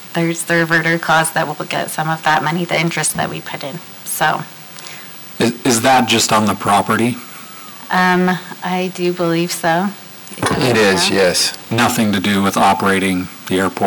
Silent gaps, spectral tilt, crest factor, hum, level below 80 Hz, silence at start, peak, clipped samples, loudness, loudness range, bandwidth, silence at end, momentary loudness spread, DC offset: none; -4 dB/octave; 12 dB; none; -52 dBFS; 0 s; -4 dBFS; under 0.1%; -15 LUFS; 4 LU; over 20 kHz; 0 s; 16 LU; under 0.1%